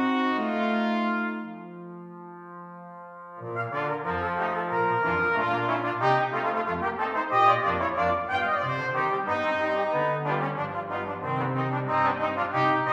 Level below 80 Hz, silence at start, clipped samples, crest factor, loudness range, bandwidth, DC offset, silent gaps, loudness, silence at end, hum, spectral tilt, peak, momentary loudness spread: -60 dBFS; 0 s; under 0.1%; 18 dB; 7 LU; 9.6 kHz; under 0.1%; none; -26 LUFS; 0 s; none; -7 dB/octave; -8 dBFS; 18 LU